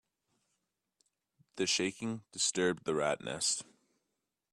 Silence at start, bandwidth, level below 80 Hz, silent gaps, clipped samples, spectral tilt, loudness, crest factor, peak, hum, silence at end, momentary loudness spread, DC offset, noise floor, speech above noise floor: 1.55 s; 13 kHz; -74 dBFS; none; under 0.1%; -2.5 dB/octave; -33 LUFS; 20 dB; -18 dBFS; none; 0.9 s; 9 LU; under 0.1%; -86 dBFS; 52 dB